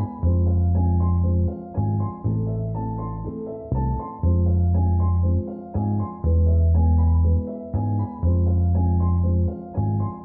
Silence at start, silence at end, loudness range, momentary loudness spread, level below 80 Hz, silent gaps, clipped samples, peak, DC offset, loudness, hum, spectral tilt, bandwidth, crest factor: 0 s; 0 s; 4 LU; 9 LU; -28 dBFS; none; under 0.1%; -10 dBFS; under 0.1%; -22 LUFS; none; -16 dB/octave; 1.8 kHz; 10 dB